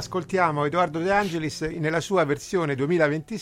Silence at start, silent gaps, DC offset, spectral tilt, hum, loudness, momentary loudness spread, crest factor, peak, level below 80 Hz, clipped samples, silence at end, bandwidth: 0 s; none; under 0.1%; -5.5 dB/octave; none; -24 LUFS; 5 LU; 18 dB; -6 dBFS; -52 dBFS; under 0.1%; 0 s; 16 kHz